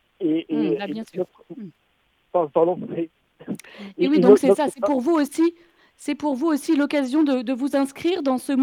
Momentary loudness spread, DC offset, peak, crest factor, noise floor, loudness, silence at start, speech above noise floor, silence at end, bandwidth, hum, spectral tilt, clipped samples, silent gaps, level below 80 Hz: 17 LU; under 0.1%; 0 dBFS; 22 dB; -66 dBFS; -21 LUFS; 0.2 s; 45 dB; 0 s; 15 kHz; none; -6 dB/octave; under 0.1%; none; -70 dBFS